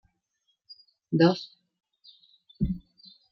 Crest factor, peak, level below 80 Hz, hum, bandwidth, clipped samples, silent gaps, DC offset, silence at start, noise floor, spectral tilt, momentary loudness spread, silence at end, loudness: 22 dB; -8 dBFS; -48 dBFS; none; 6.4 kHz; under 0.1%; none; under 0.1%; 0.7 s; -76 dBFS; -8 dB/octave; 15 LU; 0.55 s; -27 LUFS